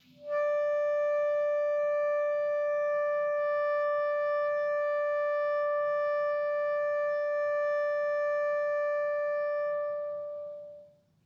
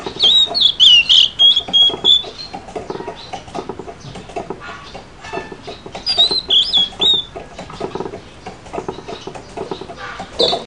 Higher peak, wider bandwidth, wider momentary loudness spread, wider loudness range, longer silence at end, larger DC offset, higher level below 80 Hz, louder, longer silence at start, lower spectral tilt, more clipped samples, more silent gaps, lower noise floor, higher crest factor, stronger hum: second, -22 dBFS vs 0 dBFS; second, 6.2 kHz vs 10.5 kHz; second, 4 LU vs 23 LU; second, 2 LU vs 19 LU; first, 0.4 s vs 0 s; second, under 0.1% vs 0.4%; second, -84 dBFS vs -46 dBFS; second, -30 LUFS vs -10 LUFS; first, 0.2 s vs 0 s; first, -4 dB/octave vs -2 dB/octave; neither; neither; first, -56 dBFS vs -35 dBFS; second, 8 dB vs 18 dB; neither